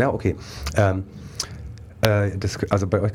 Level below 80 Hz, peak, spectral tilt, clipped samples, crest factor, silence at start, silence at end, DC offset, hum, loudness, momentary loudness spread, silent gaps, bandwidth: -40 dBFS; 0 dBFS; -6 dB/octave; under 0.1%; 22 dB; 0 s; 0 s; under 0.1%; none; -23 LUFS; 12 LU; none; 18.5 kHz